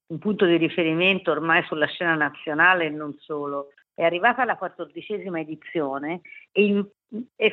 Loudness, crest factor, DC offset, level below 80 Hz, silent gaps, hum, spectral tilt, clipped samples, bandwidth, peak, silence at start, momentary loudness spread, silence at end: -23 LUFS; 20 dB; under 0.1%; -74 dBFS; none; none; -8 dB/octave; under 0.1%; 4.4 kHz; -4 dBFS; 0.1 s; 14 LU; 0 s